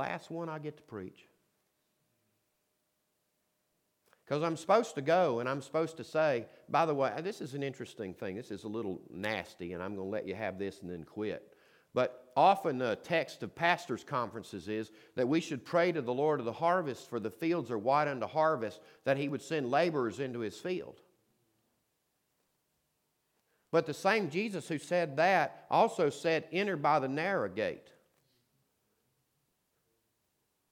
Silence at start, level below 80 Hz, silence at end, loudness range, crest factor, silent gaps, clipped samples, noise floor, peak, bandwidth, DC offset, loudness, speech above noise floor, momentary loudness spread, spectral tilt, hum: 0 s; -78 dBFS; 2.9 s; 10 LU; 22 dB; none; under 0.1%; -80 dBFS; -12 dBFS; 16.5 kHz; under 0.1%; -33 LUFS; 47 dB; 12 LU; -5.5 dB/octave; none